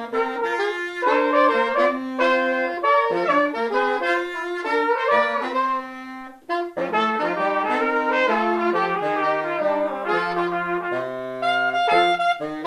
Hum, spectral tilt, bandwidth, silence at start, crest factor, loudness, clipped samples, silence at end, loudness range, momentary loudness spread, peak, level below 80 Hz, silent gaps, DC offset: none; -5 dB/octave; 13.5 kHz; 0 s; 16 dB; -21 LUFS; under 0.1%; 0 s; 3 LU; 8 LU; -6 dBFS; -64 dBFS; none; under 0.1%